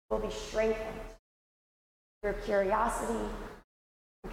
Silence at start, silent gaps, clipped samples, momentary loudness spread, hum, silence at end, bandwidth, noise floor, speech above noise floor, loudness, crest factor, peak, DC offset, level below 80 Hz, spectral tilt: 0.1 s; 1.19-2.21 s, 3.64-4.22 s; under 0.1%; 17 LU; none; 0 s; 16.5 kHz; under -90 dBFS; over 58 dB; -33 LUFS; 18 dB; -18 dBFS; under 0.1%; -48 dBFS; -4.5 dB/octave